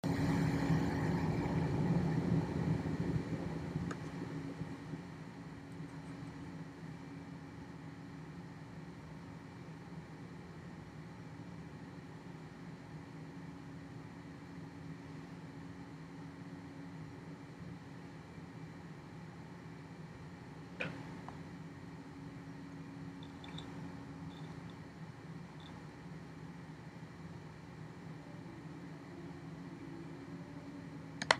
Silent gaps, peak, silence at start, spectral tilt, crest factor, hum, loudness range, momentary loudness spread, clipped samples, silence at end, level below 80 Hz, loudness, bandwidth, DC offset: none; -8 dBFS; 0.05 s; -6.5 dB/octave; 36 dB; none; 13 LU; 15 LU; under 0.1%; 0 s; -60 dBFS; -44 LUFS; 14 kHz; under 0.1%